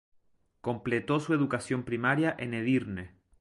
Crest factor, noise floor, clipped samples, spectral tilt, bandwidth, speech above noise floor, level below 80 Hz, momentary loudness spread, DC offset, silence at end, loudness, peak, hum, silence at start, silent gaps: 18 dB; -67 dBFS; under 0.1%; -6.5 dB/octave; 11.5 kHz; 38 dB; -60 dBFS; 12 LU; under 0.1%; 0.35 s; -30 LUFS; -12 dBFS; none; 0.65 s; none